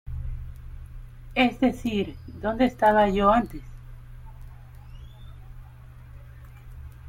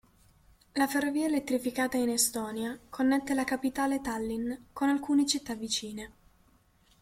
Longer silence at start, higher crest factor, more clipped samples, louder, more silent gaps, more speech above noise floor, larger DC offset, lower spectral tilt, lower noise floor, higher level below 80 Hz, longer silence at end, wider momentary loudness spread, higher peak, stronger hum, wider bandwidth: second, 0.05 s vs 0.75 s; about the same, 20 dB vs 18 dB; neither; first, -24 LUFS vs -30 LUFS; neither; second, 22 dB vs 35 dB; neither; first, -6.5 dB/octave vs -2.5 dB/octave; second, -45 dBFS vs -65 dBFS; first, -40 dBFS vs -62 dBFS; second, 0 s vs 0.9 s; first, 27 LU vs 10 LU; first, -8 dBFS vs -14 dBFS; neither; about the same, 16.5 kHz vs 16.5 kHz